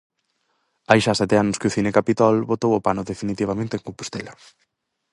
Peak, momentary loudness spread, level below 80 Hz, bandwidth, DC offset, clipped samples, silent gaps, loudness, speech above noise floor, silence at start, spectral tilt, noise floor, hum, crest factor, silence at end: 0 dBFS; 14 LU; -52 dBFS; 11.5 kHz; under 0.1%; under 0.1%; none; -21 LUFS; 50 dB; 0.9 s; -5.5 dB/octave; -71 dBFS; none; 22 dB; 0.8 s